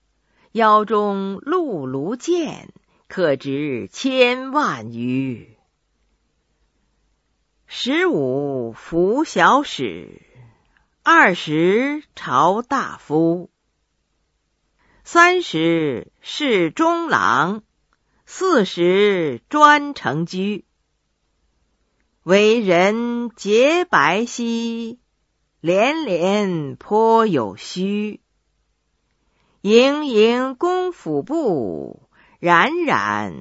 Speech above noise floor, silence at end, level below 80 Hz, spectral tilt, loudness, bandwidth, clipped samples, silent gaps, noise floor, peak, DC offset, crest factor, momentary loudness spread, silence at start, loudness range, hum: 52 dB; 0 s; -62 dBFS; -5 dB/octave; -18 LUFS; 8 kHz; under 0.1%; none; -70 dBFS; 0 dBFS; under 0.1%; 20 dB; 13 LU; 0.55 s; 5 LU; none